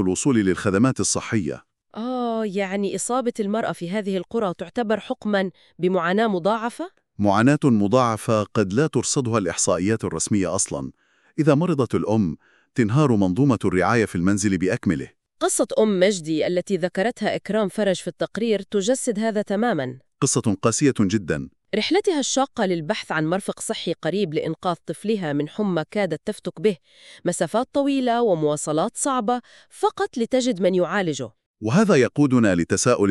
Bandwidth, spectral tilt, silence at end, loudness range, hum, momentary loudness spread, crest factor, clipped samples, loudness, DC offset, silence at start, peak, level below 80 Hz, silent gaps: 13 kHz; -5 dB/octave; 0 s; 4 LU; none; 9 LU; 18 dB; under 0.1%; -22 LUFS; under 0.1%; 0 s; -4 dBFS; -56 dBFS; 31.46-31.54 s